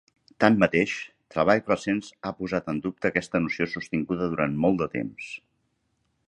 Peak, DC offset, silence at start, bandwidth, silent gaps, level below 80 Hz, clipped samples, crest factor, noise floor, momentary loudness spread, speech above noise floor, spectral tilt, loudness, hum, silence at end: -2 dBFS; under 0.1%; 0.4 s; 10 kHz; none; -56 dBFS; under 0.1%; 26 dB; -73 dBFS; 13 LU; 48 dB; -6.5 dB/octave; -26 LUFS; none; 0.9 s